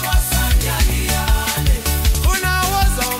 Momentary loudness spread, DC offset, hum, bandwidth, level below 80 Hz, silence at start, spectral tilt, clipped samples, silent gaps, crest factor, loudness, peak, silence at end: 1 LU; under 0.1%; none; 16.5 kHz; -18 dBFS; 0 s; -3.5 dB/octave; under 0.1%; none; 12 dB; -17 LUFS; -4 dBFS; 0 s